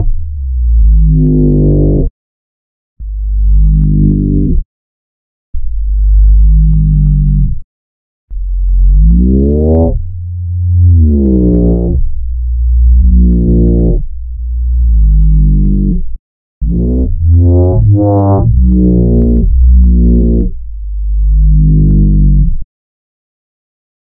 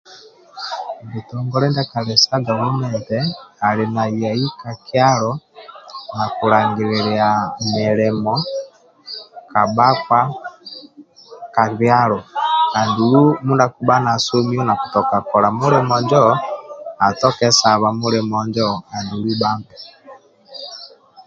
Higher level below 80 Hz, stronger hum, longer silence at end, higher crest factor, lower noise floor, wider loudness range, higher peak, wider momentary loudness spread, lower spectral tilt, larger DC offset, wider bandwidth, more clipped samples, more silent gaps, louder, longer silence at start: first, -10 dBFS vs -56 dBFS; neither; first, 1.35 s vs 0.05 s; second, 8 dB vs 18 dB; first, under -90 dBFS vs -43 dBFS; about the same, 4 LU vs 4 LU; about the same, 0 dBFS vs 0 dBFS; second, 12 LU vs 18 LU; first, -17.5 dB/octave vs -5 dB/octave; neither; second, 1.3 kHz vs 7.8 kHz; first, 0.1% vs under 0.1%; first, 2.10-2.96 s, 4.65-5.53 s, 7.64-8.28 s, 16.19-16.61 s vs none; first, -10 LUFS vs -17 LUFS; about the same, 0 s vs 0.1 s